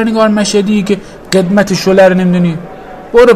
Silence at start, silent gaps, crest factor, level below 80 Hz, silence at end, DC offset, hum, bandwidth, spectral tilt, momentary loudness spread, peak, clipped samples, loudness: 0 s; none; 10 dB; -38 dBFS; 0 s; under 0.1%; none; 14 kHz; -5.5 dB/octave; 11 LU; 0 dBFS; 2%; -10 LUFS